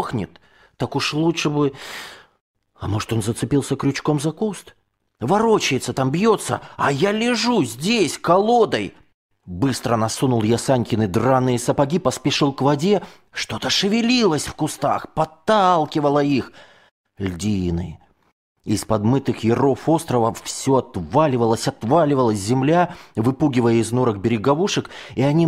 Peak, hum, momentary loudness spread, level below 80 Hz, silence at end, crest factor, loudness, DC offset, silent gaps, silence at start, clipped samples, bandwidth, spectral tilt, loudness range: -4 dBFS; none; 9 LU; -50 dBFS; 0 s; 16 dB; -20 LUFS; under 0.1%; 2.41-2.54 s, 9.14-9.29 s, 16.91-17.04 s, 18.32-18.55 s; 0 s; under 0.1%; 16 kHz; -5.5 dB/octave; 5 LU